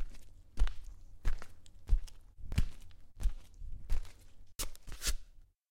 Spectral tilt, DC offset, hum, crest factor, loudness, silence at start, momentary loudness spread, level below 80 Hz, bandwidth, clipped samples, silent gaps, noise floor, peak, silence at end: -3.5 dB/octave; under 0.1%; none; 18 dB; -42 LUFS; 0 s; 18 LU; -38 dBFS; 16 kHz; under 0.1%; none; -54 dBFS; -16 dBFS; 0.25 s